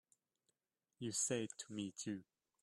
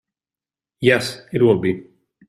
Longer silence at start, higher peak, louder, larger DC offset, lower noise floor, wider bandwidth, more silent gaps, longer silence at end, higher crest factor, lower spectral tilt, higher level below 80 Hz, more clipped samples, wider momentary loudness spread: first, 1 s vs 0.8 s; second, -26 dBFS vs -2 dBFS; second, -43 LUFS vs -18 LUFS; neither; about the same, under -90 dBFS vs under -90 dBFS; about the same, 13 kHz vs 14 kHz; neither; about the same, 0.4 s vs 0.45 s; about the same, 20 dB vs 18 dB; second, -3.5 dB/octave vs -6 dB/octave; second, -84 dBFS vs -56 dBFS; neither; about the same, 10 LU vs 9 LU